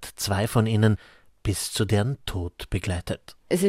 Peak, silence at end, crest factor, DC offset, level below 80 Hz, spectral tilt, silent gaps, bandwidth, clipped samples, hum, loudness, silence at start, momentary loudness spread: -6 dBFS; 0 s; 20 dB; under 0.1%; -44 dBFS; -5.5 dB/octave; none; 16 kHz; under 0.1%; none; -26 LUFS; 0 s; 11 LU